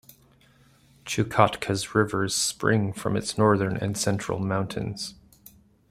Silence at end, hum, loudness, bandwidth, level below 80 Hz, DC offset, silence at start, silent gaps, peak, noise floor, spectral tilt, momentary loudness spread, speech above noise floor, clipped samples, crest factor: 0.75 s; none; -25 LUFS; 15.5 kHz; -56 dBFS; under 0.1%; 1.05 s; none; -2 dBFS; -58 dBFS; -4.5 dB/octave; 10 LU; 33 dB; under 0.1%; 24 dB